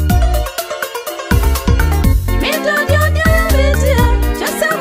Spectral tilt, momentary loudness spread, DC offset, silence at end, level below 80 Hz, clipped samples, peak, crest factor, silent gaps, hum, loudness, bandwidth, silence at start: -5 dB/octave; 9 LU; under 0.1%; 0 s; -16 dBFS; under 0.1%; 0 dBFS; 12 dB; none; none; -14 LUFS; 16 kHz; 0 s